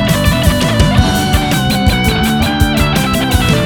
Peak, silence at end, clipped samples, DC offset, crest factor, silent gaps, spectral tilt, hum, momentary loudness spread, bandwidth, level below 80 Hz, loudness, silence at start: 0 dBFS; 0 s; 0.1%; under 0.1%; 12 dB; none; -5 dB/octave; none; 2 LU; 19.5 kHz; -20 dBFS; -12 LUFS; 0 s